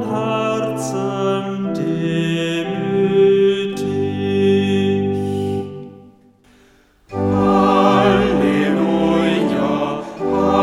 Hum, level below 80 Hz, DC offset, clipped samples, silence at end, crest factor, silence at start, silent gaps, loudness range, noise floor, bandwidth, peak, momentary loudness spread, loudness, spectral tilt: none; -44 dBFS; under 0.1%; under 0.1%; 0 s; 16 dB; 0 s; none; 5 LU; -52 dBFS; 12.5 kHz; -2 dBFS; 9 LU; -17 LUFS; -6.5 dB/octave